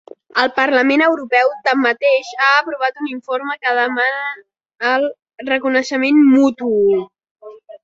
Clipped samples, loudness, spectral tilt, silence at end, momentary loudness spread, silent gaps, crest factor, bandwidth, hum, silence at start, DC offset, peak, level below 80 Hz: under 0.1%; -16 LUFS; -4 dB/octave; 0.05 s; 10 LU; 7.31-7.35 s; 16 dB; 7.6 kHz; none; 0.35 s; under 0.1%; 0 dBFS; -66 dBFS